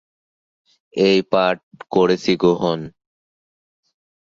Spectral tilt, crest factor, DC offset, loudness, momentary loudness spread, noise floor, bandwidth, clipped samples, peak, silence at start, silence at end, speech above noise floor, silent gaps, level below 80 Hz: -6 dB/octave; 18 dB; under 0.1%; -18 LUFS; 12 LU; under -90 dBFS; 7.4 kHz; under 0.1%; -2 dBFS; 0.95 s; 1.35 s; over 72 dB; 1.63-1.71 s; -58 dBFS